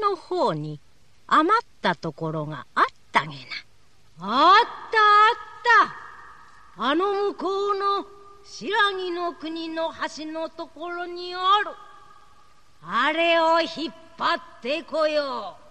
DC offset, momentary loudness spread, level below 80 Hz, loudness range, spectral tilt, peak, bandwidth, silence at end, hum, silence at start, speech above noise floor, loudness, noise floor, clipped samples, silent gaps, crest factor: 0.3%; 17 LU; -64 dBFS; 8 LU; -4.5 dB/octave; -6 dBFS; 9.6 kHz; 0.2 s; none; 0 s; 37 dB; -23 LUFS; -60 dBFS; under 0.1%; none; 18 dB